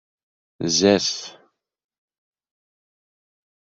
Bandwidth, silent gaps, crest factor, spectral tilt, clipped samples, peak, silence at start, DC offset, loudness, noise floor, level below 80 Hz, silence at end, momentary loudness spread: 8 kHz; none; 24 dB; -3.5 dB/octave; under 0.1%; -2 dBFS; 0.6 s; under 0.1%; -19 LUFS; under -90 dBFS; -66 dBFS; 2.45 s; 15 LU